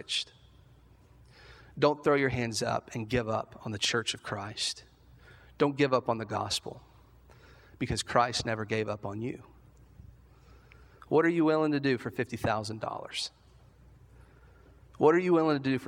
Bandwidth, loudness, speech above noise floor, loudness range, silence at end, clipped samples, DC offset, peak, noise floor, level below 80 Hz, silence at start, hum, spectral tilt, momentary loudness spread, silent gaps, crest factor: 16.5 kHz; -30 LUFS; 29 dB; 3 LU; 0 s; under 0.1%; under 0.1%; -8 dBFS; -58 dBFS; -58 dBFS; 0.1 s; none; -4.5 dB/octave; 12 LU; none; 24 dB